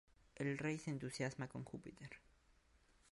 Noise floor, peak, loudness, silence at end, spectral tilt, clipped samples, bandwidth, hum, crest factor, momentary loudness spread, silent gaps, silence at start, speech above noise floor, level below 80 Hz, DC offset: -73 dBFS; -30 dBFS; -46 LUFS; 0.95 s; -5.5 dB/octave; under 0.1%; 11.5 kHz; none; 18 dB; 15 LU; none; 0.35 s; 27 dB; -74 dBFS; under 0.1%